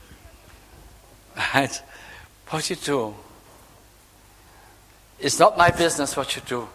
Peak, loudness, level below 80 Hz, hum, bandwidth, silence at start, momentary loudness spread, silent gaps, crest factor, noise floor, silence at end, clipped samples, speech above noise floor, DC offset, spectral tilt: 0 dBFS; -22 LUFS; -50 dBFS; none; 16 kHz; 0.1 s; 25 LU; none; 26 dB; -52 dBFS; 0.05 s; under 0.1%; 30 dB; under 0.1%; -3.5 dB/octave